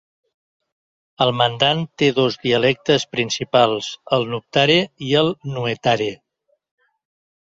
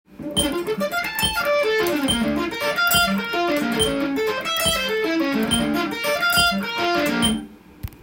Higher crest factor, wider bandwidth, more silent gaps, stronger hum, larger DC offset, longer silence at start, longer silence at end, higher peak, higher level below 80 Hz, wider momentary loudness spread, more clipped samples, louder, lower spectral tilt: about the same, 18 dB vs 16 dB; second, 7.8 kHz vs 17 kHz; neither; neither; neither; first, 1.2 s vs 0.1 s; first, 1.25 s vs 0 s; about the same, -2 dBFS vs -4 dBFS; second, -58 dBFS vs -44 dBFS; about the same, 6 LU vs 6 LU; neither; about the same, -19 LUFS vs -20 LUFS; first, -4.5 dB/octave vs -3 dB/octave